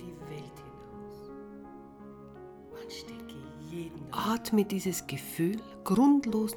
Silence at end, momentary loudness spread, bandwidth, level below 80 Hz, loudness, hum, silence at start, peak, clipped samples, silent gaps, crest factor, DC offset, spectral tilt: 0 s; 23 LU; 19.5 kHz; -62 dBFS; -30 LUFS; none; 0 s; -14 dBFS; under 0.1%; none; 18 dB; under 0.1%; -5.5 dB/octave